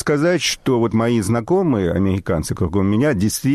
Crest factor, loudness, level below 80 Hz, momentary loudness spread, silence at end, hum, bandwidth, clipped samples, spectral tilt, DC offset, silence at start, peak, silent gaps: 10 dB; -18 LUFS; -40 dBFS; 4 LU; 0 s; none; 14.5 kHz; under 0.1%; -5.5 dB/octave; under 0.1%; 0 s; -8 dBFS; none